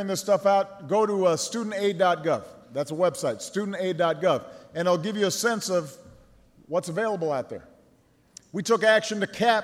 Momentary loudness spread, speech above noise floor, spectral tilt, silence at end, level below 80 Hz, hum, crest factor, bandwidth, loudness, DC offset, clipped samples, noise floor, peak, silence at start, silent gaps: 10 LU; 36 dB; -4 dB/octave; 0 s; -68 dBFS; none; 18 dB; 16 kHz; -25 LUFS; under 0.1%; under 0.1%; -61 dBFS; -8 dBFS; 0 s; none